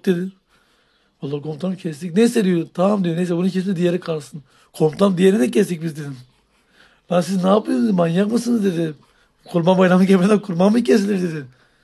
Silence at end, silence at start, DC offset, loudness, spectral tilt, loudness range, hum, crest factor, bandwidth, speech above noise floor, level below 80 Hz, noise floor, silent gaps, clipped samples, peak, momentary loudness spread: 0.35 s; 0.05 s; under 0.1%; -18 LUFS; -7 dB/octave; 4 LU; none; 16 dB; 12.5 kHz; 43 dB; -66 dBFS; -61 dBFS; none; under 0.1%; -2 dBFS; 13 LU